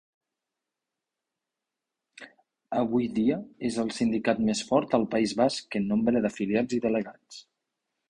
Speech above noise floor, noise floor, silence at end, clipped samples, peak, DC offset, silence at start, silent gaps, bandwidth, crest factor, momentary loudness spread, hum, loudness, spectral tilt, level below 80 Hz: 61 dB; -87 dBFS; 0.7 s; under 0.1%; -8 dBFS; under 0.1%; 2.2 s; none; 10.5 kHz; 20 dB; 7 LU; none; -27 LUFS; -5.5 dB/octave; -62 dBFS